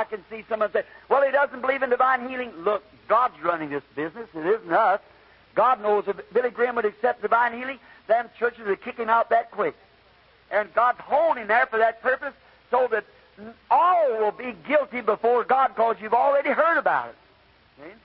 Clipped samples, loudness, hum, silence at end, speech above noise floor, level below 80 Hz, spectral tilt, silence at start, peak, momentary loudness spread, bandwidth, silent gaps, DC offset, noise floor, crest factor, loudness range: under 0.1%; -23 LUFS; none; 0.1 s; 34 dB; -66 dBFS; -8.5 dB/octave; 0 s; -8 dBFS; 10 LU; 5.6 kHz; none; under 0.1%; -57 dBFS; 16 dB; 3 LU